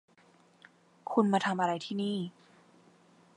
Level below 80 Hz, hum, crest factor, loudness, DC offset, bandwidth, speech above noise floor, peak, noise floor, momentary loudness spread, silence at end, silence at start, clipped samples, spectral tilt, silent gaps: -84 dBFS; none; 22 dB; -31 LUFS; under 0.1%; 10.5 kHz; 33 dB; -12 dBFS; -63 dBFS; 13 LU; 1.05 s; 1.05 s; under 0.1%; -6 dB/octave; none